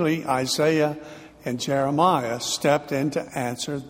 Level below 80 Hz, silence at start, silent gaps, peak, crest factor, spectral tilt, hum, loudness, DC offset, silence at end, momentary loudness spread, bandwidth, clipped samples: -60 dBFS; 0 s; none; -6 dBFS; 18 dB; -4.5 dB/octave; none; -23 LUFS; under 0.1%; 0 s; 10 LU; 16 kHz; under 0.1%